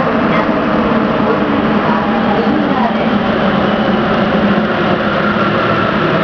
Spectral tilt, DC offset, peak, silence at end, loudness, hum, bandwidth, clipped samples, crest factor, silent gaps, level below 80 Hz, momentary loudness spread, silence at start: -8 dB/octave; under 0.1%; 0 dBFS; 0 s; -13 LUFS; none; 5.4 kHz; under 0.1%; 12 dB; none; -36 dBFS; 1 LU; 0 s